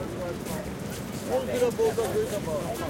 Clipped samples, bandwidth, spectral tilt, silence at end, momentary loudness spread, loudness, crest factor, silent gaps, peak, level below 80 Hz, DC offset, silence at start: under 0.1%; 17 kHz; -5 dB/octave; 0 s; 9 LU; -29 LUFS; 14 dB; none; -14 dBFS; -48 dBFS; under 0.1%; 0 s